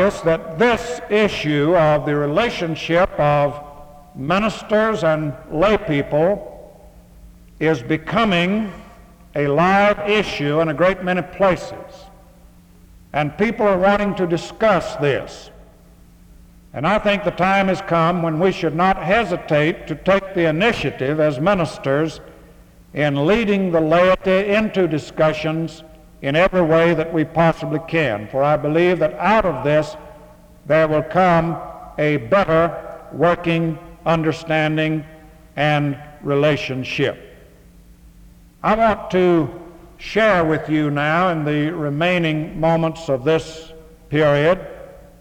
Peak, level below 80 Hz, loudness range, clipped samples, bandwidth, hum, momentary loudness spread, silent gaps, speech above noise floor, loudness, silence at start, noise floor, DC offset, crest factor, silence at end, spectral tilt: -4 dBFS; -44 dBFS; 3 LU; under 0.1%; 16 kHz; none; 10 LU; none; 29 dB; -18 LUFS; 0 s; -47 dBFS; under 0.1%; 16 dB; 0.2 s; -6.5 dB/octave